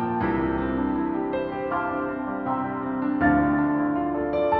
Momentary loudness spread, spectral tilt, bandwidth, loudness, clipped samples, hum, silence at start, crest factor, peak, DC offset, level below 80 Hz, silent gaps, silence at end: 7 LU; -10.5 dB/octave; 4.6 kHz; -25 LUFS; under 0.1%; none; 0 s; 16 dB; -8 dBFS; under 0.1%; -44 dBFS; none; 0 s